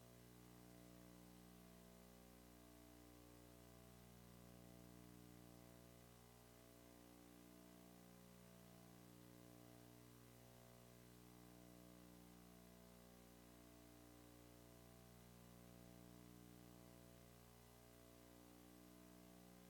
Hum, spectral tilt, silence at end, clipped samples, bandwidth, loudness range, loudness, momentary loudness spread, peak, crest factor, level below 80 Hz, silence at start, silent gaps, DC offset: 60 Hz at -70 dBFS; -5 dB/octave; 0 s; under 0.1%; 18 kHz; 1 LU; -65 LUFS; 2 LU; -52 dBFS; 14 dB; -76 dBFS; 0 s; none; under 0.1%